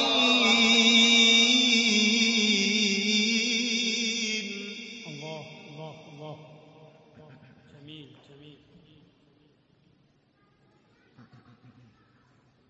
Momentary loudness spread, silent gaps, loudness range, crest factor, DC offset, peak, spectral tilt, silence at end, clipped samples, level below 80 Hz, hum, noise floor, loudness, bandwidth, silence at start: 26 LU; none; 24 LU; 20 dB; under 0.1%; -8 dBFS; -1.5 dB/octave; 4.2 s; under 0.1%; -72 dBFS; none; -66 dBFS; -21 LUFS; 8.2 kHz; 0 s